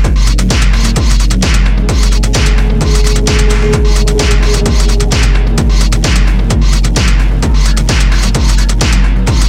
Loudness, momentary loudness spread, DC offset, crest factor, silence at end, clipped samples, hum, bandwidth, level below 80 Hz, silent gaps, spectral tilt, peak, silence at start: -11 LUFS; 1 LU; under 0.1%; 8 dB; 0 s; under 0.1%; none; 12.5 kHz; -8 dBFS; none; -4.5 dB/octave; 0 dBFS; 0 s